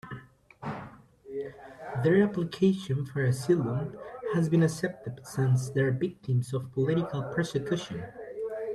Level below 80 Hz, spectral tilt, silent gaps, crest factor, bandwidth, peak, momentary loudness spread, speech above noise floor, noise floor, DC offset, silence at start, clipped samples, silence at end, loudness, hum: -62 dBFS; -7 dB/octave; none; 18 dB; 13 kHz; -12 dBFS; 16 LU; 21 dB; -49 dBFS; under 0.1%; 0.05 s; under 0.1%; 0 s; -29 LUFS; none